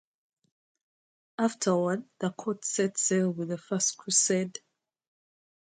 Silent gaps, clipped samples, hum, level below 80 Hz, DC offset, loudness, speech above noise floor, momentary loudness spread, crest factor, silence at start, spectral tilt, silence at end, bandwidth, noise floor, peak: none; under 0.1%; none; -78 dBFS; under 0.1%; -28 LUFS; over 61 dB; 10 LU; 18 dB; 1.4 s; -3.5 dB/octave; 1.1 s; 9.6 kHz; under -90 dBFS; -12 dBFS